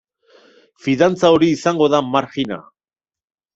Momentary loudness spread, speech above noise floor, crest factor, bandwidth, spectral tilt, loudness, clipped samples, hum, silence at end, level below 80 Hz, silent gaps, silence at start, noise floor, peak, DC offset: 12 LU; over 74 dB; 18 dB; 8 kHz; -5.5 dB/octave; -16 LUFS; under 0.1%; none; 0.95 s; -56 dBFS; none; 0.85 s; under -90 dBFS; 0 dBFS; under 0.1%